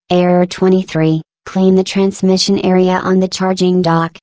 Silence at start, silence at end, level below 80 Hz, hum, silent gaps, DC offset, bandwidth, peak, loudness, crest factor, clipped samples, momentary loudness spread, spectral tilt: 0.1 s; 0.15 s; -50 dBFS; none; none; under 0.1%; 8 kHz; 0 dBFS; -13 LUFS; 12 dB; under 0.1%; 3 LU; -6 dB/octave